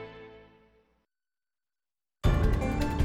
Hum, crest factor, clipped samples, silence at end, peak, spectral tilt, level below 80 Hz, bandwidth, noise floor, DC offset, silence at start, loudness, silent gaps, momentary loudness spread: none; 18 dB; under 0.1%; 0 s; -14 dBFS; -7 dB/octave; -34 dBFS; 15.5 kHz; under -90 dBFS; under 0.1%; 0 s; -29 LUFS; none; 22 LU